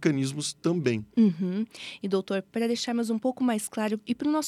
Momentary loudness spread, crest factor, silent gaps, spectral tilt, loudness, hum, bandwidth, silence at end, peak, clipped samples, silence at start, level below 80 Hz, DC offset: 6 LU; 18 dB; none; -5.5 dB/octave; -28 LUFS; none; 14 kHz; 0 s; -10 dBFS; under 0.1%; 0 s; -70 dBFS; under 0.1%